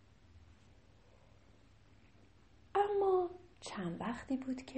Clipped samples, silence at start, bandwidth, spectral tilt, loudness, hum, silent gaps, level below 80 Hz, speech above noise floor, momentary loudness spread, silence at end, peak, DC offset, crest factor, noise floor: under 0.1%; 0.35 s; 8.4 kHz; -6 dB/octave; -37 LUFS; none; none; -68 dBFS; 24 dB; 11 LU; 0 s; -20 dBFS; under 0.1%; 20 dB; -65 dBFS